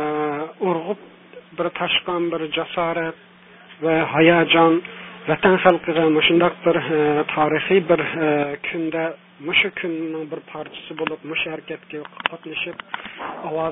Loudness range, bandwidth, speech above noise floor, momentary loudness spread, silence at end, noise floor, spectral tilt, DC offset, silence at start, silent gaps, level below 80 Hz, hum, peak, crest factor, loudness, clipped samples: 10 LU; 3.9 kHz; 26 dB; 17 LU; 0 s; -46 dBFS; -9 dB/octave; under 0.1%; 0 s; none; -58 dBFS; none; 0 dBFS; 20 dB; -20 LUFS; under 0.1%